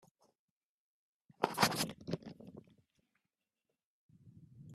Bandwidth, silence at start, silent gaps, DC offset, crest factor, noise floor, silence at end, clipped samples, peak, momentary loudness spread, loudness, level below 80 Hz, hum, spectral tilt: 14 kHz; 1.4 s; 3.85-4.09 s; under 0.1%; 34 dB; -90 dBFS; 0 s; under 0.1%; -10 dBFS; 23 LU; -36 LUFS; -74 dBFS; none; -3.5 dB/octave